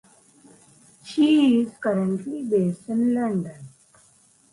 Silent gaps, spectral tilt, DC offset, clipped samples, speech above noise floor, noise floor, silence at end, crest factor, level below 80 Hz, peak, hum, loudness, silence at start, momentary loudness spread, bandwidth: none; -7 dB/octave; under 0.1%; under 0.1%; 36 dB; -58 dBFS; 0.85 s; 14 dB; -68 dBFS; -10 dBFS; none; -22 LUFS; 1.05 s; 11 LU; 11.5 kHz